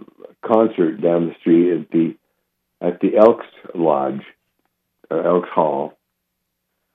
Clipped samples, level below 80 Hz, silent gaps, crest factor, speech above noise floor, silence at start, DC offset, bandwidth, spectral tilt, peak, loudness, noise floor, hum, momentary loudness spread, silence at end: under 0.1%; -68 dBFS; none; 20 dB; 58 dB; 0.45 s; under 0.1%; 3.9 kHz; -10 dB/octave; 0 dBFS; -18 LUFS; -75 dBFS; none; 12 LU; 1.05 s